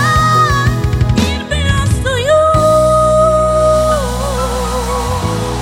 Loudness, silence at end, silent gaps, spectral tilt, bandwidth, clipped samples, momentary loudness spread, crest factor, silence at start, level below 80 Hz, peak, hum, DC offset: -12 LUFS; 0 s; none; -5.5 dB/octave; 17 kHz; under 0.1%; 7 LU; 10 dB; 0 s; -22 dBFS; -2 dBFS; none; under 0.1%